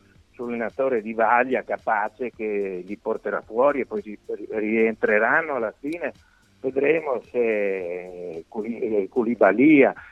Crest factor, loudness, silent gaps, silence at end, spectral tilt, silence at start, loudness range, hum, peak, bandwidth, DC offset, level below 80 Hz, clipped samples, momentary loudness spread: 20 dB; -23 LUFS; none; 0 s; -8 dB/octave; 0.4 s; 4 LU; none; -4 dBFS; 7.6 kHz; under 0.1%; -64 dBFS; under 0.1%; 14 LU